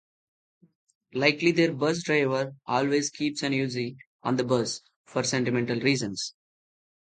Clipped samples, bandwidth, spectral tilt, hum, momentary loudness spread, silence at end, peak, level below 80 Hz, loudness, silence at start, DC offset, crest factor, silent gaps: under 0.1%; 9.4 kHz; -4.5 dB/octave; none; 11 LU; 0.9 s; -6 dBFS; -70 dBFS; -27 LUFS; 1.15 s; under 0.1%; 22 dB; 4.07-4.19 s, 4.96-5.04 s